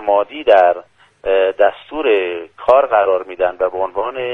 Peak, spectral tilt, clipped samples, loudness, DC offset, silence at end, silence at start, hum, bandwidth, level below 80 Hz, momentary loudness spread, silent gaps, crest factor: 0 dBFS; -5.5 dB/octave; under 0.1%; -15 LUFS; under 0.1%; 0 s; 0 s; none; 4.8 kHz; -52 dBFS; 10 LU; none; 16 dB